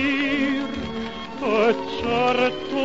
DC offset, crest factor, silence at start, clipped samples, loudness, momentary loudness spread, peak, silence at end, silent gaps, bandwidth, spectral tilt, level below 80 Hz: 0.7%; 14 dB; 0 s; under 0.1%; -23 LUFS; 10 LU; -8 dBFS; 0 s; none; 7.8 kHz; -5 dB/octave; -48 dBFS